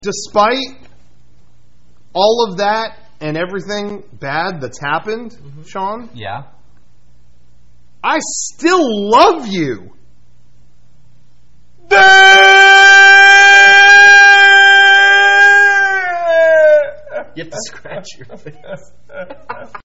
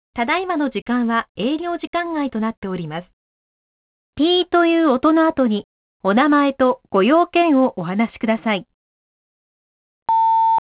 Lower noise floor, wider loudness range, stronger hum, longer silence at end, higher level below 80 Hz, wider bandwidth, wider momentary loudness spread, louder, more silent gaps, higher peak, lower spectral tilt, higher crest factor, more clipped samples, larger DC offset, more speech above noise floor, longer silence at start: second, -52 dBFS vs under -90 dBFS; first, 20 LU vs 7 LU; neither; about the same, 0.1 s vs 0.1 s; first, -50 dBFS vs -56 dBFS; first, 8.2 kHz vs 4 kHz; first, 25 LU vs 10 LU; first, -6 LUFS vs -18 LUFS; second, none vs 0.82-0.86 s, 1.29-1.35 s, 1.87-1.93 s, 2.57-2.62 s, 3.13-4.13 s, 5.64-6.00 s, 8.74-10.06 s; first, 0 dBFS vs -6 dBFS; second, -1.5 dB/octave vs -9.5 dB/octave; about the same, 12 dB vs 14 dB; first, 0.2% vs under 0.1%; first, 2% vs under 0.1%; second, 38 dB vs over 72 dB; about the same, 0.05 s vs 0.15 s